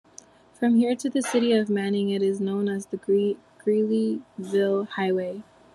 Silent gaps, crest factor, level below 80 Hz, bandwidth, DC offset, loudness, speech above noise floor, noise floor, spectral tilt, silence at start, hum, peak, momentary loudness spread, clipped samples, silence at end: none; 14 dB; -70 dBFS; 12 kHz; under 0.1%; -25 LUFS; 28 dB; -51 dBFS; -6 dB/octave; 0.6 s; none; -10 dBFS; 7 LU; under 0.1%; 0.3 s